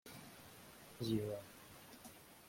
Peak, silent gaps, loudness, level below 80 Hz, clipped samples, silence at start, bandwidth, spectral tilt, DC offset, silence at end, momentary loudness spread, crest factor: -26 dBFS; none; -47 LUFS; -72 dBFS; under 0.1%; 0.05 s; 16.5 kHz; -5.5 dB/octave; under 0.1%; 0 s; 17 LU; 20 dB